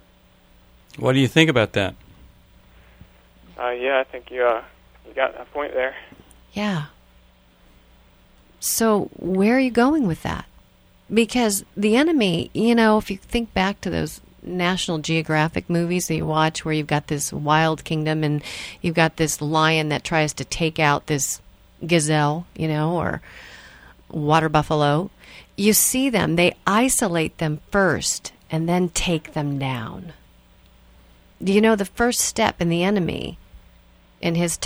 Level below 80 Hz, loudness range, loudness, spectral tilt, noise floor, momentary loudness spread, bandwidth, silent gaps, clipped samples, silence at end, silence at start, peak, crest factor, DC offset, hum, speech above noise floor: -46 dBFS; 7 LU; -21 LUFS; -4.5 dB/octave; -54 dBFS; 12 LU; over 20 kHz; none; under 0.1%; 0 s; 0.95 s; 0 dBFS; 22 dB; under 0.1%; none; 33 dB